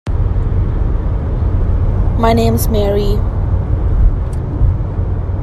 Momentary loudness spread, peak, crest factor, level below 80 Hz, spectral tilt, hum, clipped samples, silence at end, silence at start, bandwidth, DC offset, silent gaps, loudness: 6 LU; 0 dBFS; 12 dB; -16 dBFS; -7.5 dB/octave; none; under 0.1%; 0 s; 0.05 s; 15 kHz; under 0.1%; none; -16 LUFS